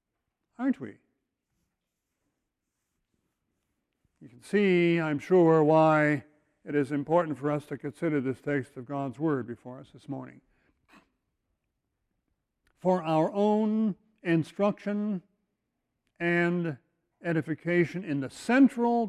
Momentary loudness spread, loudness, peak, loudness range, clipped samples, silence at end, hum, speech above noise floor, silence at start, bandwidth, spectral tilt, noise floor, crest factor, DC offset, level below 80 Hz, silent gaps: 16 LU; -27 LUFS; -10 dBFS; 14 LU; under 0.1%; 0 s; none; 57 dB; 0.6 s; 12 kHz; -7.5 dB/octave; -84 dBFS; 18 dB; under 0.1%; -72 dBFS; none